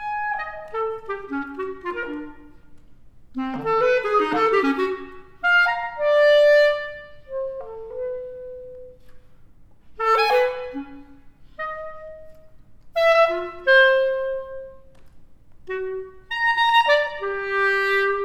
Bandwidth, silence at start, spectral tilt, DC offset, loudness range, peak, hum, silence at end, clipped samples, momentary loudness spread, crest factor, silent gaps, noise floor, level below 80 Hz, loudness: 15 kHz; 0 s; -3.5 dB/octave; under 0.1%; 9 LU; -6 dBFS; none; 0 s; under 0.1%; 20 LU; 18 dB; none; -47 dBFS; -54 dBFS; -21 LUFS